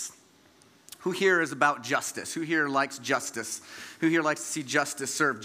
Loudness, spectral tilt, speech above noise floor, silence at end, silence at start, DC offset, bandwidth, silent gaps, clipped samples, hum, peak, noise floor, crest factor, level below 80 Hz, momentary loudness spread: -28 LUFS; -3 dB/octave; 31 dB; 0 s; 0 s; under 0.1%; 16 kHz; none; under 0.1%; none; -6 dBFS; -59 dBFS; 22 dB; -80 dBFS; 11 LU